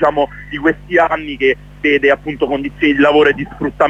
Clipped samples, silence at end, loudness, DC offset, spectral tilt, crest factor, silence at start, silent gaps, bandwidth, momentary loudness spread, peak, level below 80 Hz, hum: under 0.1%; 0 s; -14 LUFS; under 0.1%; -6.5 dB/octave; 14 dB; 0 s; none; 7.8 kHz; 8 LU; 0 dBFS; -40 dBFS; 50 Hz at -35 dBFS